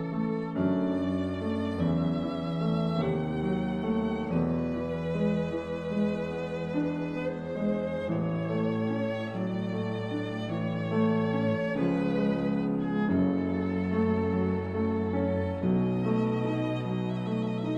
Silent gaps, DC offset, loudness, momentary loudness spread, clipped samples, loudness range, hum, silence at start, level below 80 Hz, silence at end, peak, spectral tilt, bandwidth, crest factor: none; under 0.1%; -29 LUFS; 5 LU; under 0.1%; 3 LU; none; 0 s; -54 dBFS; 0 s; -16 dBFS; -9 dB/octave; 8.6 kHz; 14 dB